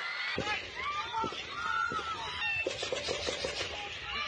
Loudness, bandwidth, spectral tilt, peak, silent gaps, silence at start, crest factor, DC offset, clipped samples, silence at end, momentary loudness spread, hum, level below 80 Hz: -34 LUFS; 10.5 kHz; -2 dB/octave; -20 dBFS; none; 0 s; 16 dB; under 0.1%; under 0.1%; 0 s; 5 LU; none; -60 dBFS